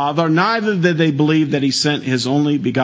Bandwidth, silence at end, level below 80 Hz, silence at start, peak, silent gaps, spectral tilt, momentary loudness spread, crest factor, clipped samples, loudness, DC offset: 8 kHz; 0 s; -60 dBFS; 0 s; 0 dBFS; none; -5.5 dB/octave; 2 LU; 14 dB; under 0.1%; -16 LUFS; under 0.1%